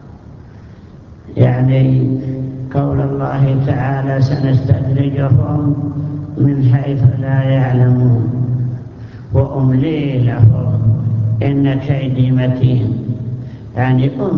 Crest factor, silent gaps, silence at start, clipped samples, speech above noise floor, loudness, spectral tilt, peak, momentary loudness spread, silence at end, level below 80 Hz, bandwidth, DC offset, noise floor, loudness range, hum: 14 dB; none; 0 s; under 0.1%; 23 dB; -14 LUFS; -10.5 dB/octave; 0 dBFS; 10 LU; 0 s; -36 dBFS; 5.4 kHz; under 0.1%; -36 dBFS; 2 LU; none